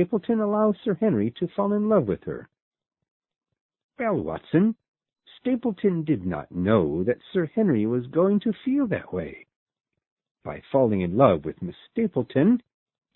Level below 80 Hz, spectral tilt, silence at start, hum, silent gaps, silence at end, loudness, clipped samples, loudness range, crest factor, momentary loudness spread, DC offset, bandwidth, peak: -54 dBFS; -12.5 dB/octave; 0 s; none; 2.62-2.71 s, 3.11-3.20 s, 3.61-3.69 s, 3.84-3.89 s, 4.88-4.94 s, 9.56-9.66 s, 10.11-10.17 s, 10.31-10.35 s; 0.55 s; -24 LUFS; under 0.1%; 4 LU; 22 dB; 11 LU; under 0.1%; 4.1 kHz; -4 dBFS